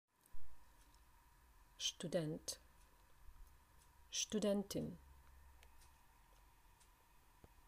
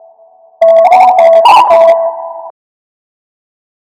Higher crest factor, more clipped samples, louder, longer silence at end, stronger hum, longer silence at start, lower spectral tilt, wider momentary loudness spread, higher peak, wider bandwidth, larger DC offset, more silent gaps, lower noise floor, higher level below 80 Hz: first, 20 dB vs 8 dB; second, under 0.1% vs 5%; second, -43 LUFS vs -5 LUFS; second, 0.05 s vs 1.5 s; neither; second, 0.35 s vs 0.6 s; first, -3.5 dB/octave vs -2 dB/octave; first, 27 LU vs 13 LU; second, -28 dBFS vs 0 dBFS; first, 15.5 kHz vs 11.5 kHz; neither; neither; first, -69 dBFS vs -42 dBFS; second, -68 dBFS vs -58 dBFS